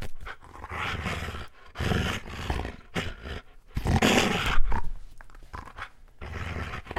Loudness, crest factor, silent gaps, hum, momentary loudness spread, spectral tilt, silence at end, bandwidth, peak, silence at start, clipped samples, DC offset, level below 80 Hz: -29 LUFS; 22 dB; none; none; 20 LU; -4.5 dB/octave; 0 s; 14 kHz; -6 dBFS; 0 s; under 0.1%; under 0.1%; -34 dBFS